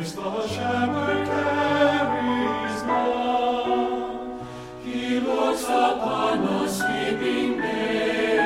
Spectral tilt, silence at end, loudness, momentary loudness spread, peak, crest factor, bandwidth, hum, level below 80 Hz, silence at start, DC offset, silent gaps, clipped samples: -4.5 dB/octave; 0 s; -24 LUFS; 8 LU; -8 dBFS; 14 dB; 16 kHz; none; -54 dBFS; 0 s; under 0.1%; none; under 0.1%